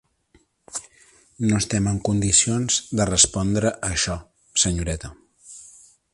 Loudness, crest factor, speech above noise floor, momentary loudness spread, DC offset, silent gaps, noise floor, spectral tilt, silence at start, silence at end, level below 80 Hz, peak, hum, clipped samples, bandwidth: -20 LUFS; 22 dB; 39 dB; 17 LU; under 0.1%; none; -61 dBFS; -3.5 dB/octave; 0.75 s; 0.45 s; -40 dBFS; -2 dBFS; none; under 0.1%; 11.5 kHz